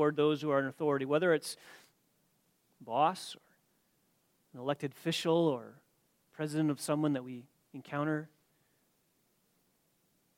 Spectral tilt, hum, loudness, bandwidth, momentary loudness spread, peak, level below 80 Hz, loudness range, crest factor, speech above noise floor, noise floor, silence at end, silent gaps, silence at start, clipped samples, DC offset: -5.5 dB/octave; none; -33 LUFS; 16.5 kHz; 18 LU; -16 dBFS; -84 dBFS; 5 LU; 20 dB; 42 dB; -75 dBFS; 2.1 s; none; 0 s; under 0.1%; under 0.1%